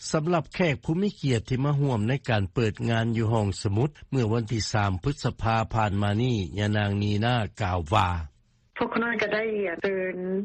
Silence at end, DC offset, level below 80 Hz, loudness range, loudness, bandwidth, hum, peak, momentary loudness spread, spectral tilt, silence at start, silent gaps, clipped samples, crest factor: 0 s; under 0.1%; -46 dBFS; 1 LU; -26 LUFS; 8.8 kHz; none; -6 dBFS; 4 LU; -6.5 dB/octave; 0 s; none; under 0.1%; 20 dB